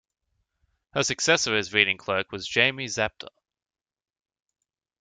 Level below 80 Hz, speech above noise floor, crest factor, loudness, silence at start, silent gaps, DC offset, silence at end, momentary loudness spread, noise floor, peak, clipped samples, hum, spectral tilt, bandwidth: -62 dBFS; 52 dB; 26 dB; -24 LUFS; 0.95 s; none; under 0.1%; 1.75 s; 10 LU; -77 dBFS; -2 dBFS; under 0.1%; none; -2 dB/octave; 10.5 kHz